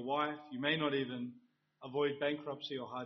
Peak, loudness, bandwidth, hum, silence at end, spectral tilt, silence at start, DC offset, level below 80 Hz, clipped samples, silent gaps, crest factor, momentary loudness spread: -18 dBFS; -37 LUFS; 6 kHz; none; 0 s; -3 dB/octave; 0 s; under 0.1%; -80 dBFS; under 0.1%; none; 20 dB; 10 LU